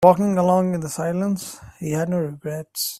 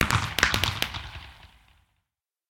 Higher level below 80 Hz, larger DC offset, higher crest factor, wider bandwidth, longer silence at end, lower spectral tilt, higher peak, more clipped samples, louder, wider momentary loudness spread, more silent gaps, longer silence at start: second, -58 dBFS vs -42 dBFS; neither; second, 20 dB vs 28 dB; about the same, 16 kHz vs 17 kHz; second, 0 s vs 1.05 s; first, -6 dB/octave vs -3 dB/octave; about the same, 0 dBFS vs 0 dBFS; neither; first, -22 LUFS vs -25 LUFS; second, 12 LU vs 21 LU; neither; about the same, 0 s vs 0 s